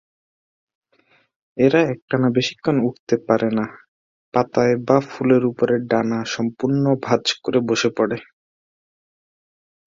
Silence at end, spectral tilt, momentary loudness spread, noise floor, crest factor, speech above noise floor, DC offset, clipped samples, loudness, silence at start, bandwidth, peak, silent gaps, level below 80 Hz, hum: 1.65 s; -6 dB/octave; 6 LU; -60 dBFS; 18 dB; 41 dB; under 0.1%; under 0.1%; -20 LUFS; 1.55 s; 7.6 kHz; -2 dBFS; 2.02-2.08 s, 2.99-3.07 s, 3.88-4.32 s; -60 dBFS; none